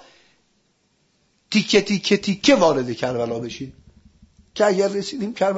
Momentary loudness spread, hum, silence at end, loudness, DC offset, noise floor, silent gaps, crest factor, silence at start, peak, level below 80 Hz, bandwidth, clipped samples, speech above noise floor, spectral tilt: 15 LU; none; 0 s; -20 LUFS; under 0.1%; -65 dBFS; none; 20 dB; 1.5 s; -2 dBFS; -56 dBFS; 8 kHz; under 0.1%; 46 dB; -4.5 dB/octave